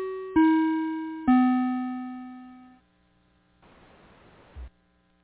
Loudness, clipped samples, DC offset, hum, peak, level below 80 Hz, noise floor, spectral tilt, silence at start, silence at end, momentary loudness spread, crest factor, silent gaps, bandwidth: -25 LUFS; under 0.1%; under 0.1%; none; -10 dBFS; -54 dBFS; -66 dBFS; -5 dB/octave; 0 s; 0.55 s; 25 LU; 18 dB; none; 4 kHz